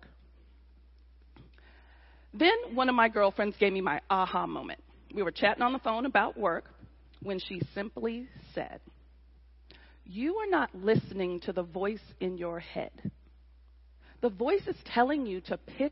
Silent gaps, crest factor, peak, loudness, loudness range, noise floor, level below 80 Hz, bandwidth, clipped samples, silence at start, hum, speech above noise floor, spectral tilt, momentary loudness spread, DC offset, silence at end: none; 22 dB; -10 dBFS; -31 LUFS; 9 LU; -57 dBFS; -58 dBFS; 5.8 kHz; under 0.1%; 1.4 s; none; 27 dB; -9 dB/octave; 15 LU; under 0.1%; 0 s